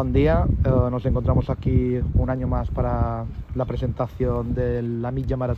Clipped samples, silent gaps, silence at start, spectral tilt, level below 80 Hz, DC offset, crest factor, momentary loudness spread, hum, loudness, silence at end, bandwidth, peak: under 0.1%; none; 0 s; -10.5 dB/octave; -28 dBFS; under 0.1%; 16 dB; 7 LU; none; -23 LUFS; 0 s; 5.4 kHz; -6 dBFS